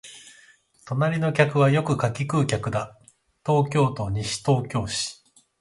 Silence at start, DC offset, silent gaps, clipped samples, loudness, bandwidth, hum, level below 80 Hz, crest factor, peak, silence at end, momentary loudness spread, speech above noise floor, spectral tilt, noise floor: 0.05 s; under 0.1%; none; under 0.1%; -24 LUFS; 11.5 kHz; none; -50 dBFS; 20 dB; -4 dBFS; 0.45 s; 11 LU; 33 dB; -5.5 dB/octave; -56 dBFS